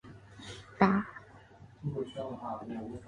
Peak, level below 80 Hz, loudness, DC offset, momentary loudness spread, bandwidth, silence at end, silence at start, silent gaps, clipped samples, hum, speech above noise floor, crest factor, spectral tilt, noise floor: -8 dBFS; -62 dBFS; -34 LUFS; under 0.1%; 21 LU; 10 kHz; 0 s; 0.05 s; none; under 0.1%; none; 22 dB; 26 dB; -7.5 dB/octave; -55 dBFS